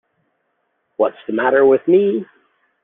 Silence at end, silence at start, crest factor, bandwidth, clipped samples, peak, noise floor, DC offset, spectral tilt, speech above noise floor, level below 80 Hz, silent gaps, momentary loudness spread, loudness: 0.6 s; 1 s; 16 dB; 3.8 kHz; under 0.1%; -2 dBFS; -69 dBFS; under 0.1%; -10 dB/octave; 54 dB; -64 dBFS; none; 10 LU; -16 LUFS